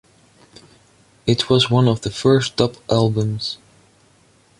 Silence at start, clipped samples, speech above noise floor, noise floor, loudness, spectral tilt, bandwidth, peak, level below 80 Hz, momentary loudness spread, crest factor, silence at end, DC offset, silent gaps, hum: 1.25 s; under 0.1%; 37 dB; -55 dBFS; -18 LUFS; -6 dB/octave; 11.5 kHz; -2 dBFS; -50 dBFS; 11 LU; 18 dB; 1.05 s; under 0.1%; none; none